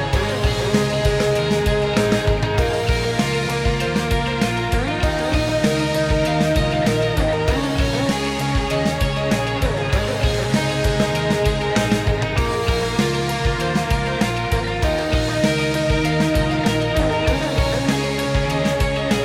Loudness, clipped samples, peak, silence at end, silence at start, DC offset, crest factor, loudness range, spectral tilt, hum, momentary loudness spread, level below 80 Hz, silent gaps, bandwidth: -19 LUFS; under 0.1%; -2 dBFS; 0 s; 0 s; under 0.1%; 16 dB; 1 LU; -5.5 dB/octave; none; 2 LU; -26 dBFS; none; 16.5 kHz